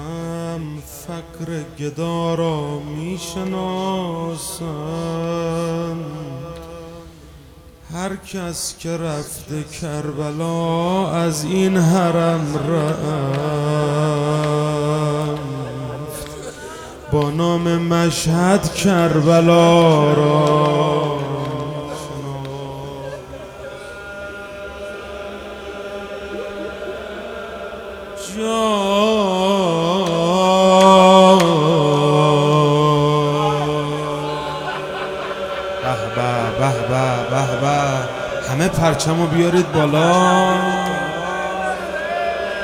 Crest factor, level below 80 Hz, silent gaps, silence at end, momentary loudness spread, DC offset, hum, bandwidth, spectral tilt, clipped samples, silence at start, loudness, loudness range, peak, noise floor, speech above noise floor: 18 dB; -46 dBFS; none; 0 s; 17 LU; under 0.1%; none; 16.5 kHz; -5.5 dB/octave; under 0.1%; 0 s; -18 LUFS; 16 LU; 0 dBFS; -42 dBFS; 25 dB